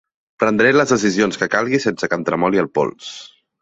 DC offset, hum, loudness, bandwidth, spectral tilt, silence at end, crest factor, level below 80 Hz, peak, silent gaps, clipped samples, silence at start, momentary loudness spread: under 0.1%; none; -17 LUFS; 8 kHz; -4.5 dB/octave; 0.35 s; 16 dB; -56 dBFS; -2 dBFS; none; under 0.1%; 0.4 s; 10 LU